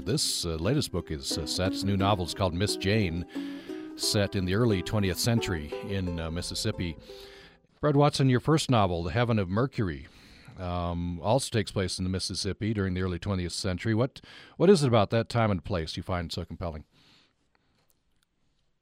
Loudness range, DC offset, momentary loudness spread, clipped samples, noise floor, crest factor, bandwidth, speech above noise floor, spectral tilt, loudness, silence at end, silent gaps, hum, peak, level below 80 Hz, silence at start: 4 LU; under 0.1%; 13 LU; under 0.1%; -71 dBFS; 20 dB; 16 kHz; 43 dB; -5.5 dB/octave; -28 LUFS; 2 s; none; none; -8 dBFS; -48 dBFS; 0 s